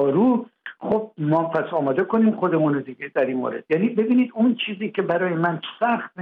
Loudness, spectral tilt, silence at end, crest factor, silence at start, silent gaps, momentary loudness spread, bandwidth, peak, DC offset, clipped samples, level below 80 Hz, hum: -22 LUFS; -9.5 dB/octave; 0 s; 12 dB; 0 s; none; 6 LU; 4.1 kHz; -8 dBFS; under 0.1%; under 0.1%; -68 dBFS; none